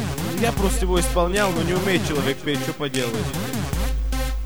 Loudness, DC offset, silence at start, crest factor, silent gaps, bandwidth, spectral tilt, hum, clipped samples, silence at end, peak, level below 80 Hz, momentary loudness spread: -23 LUFS; 1%; 0 s; 16 dB; none; over 20 kHz; -4.5 dB/octave; none; under 0.1%; 0 s; -8 dBFS; -28 dBFS; 6 LU